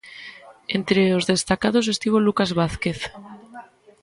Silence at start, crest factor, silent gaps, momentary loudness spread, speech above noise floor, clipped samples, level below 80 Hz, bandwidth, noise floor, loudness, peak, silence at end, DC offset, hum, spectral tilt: 0.05 s; 18 dB; none; 21 LU; 23 dB; under 0.1%; -48 dBFS; 11.5 kHz; -44 dBFS; -21 LUFS; -4 dBFS; 0.4 s; under 0.1%; none; -5 dB/octave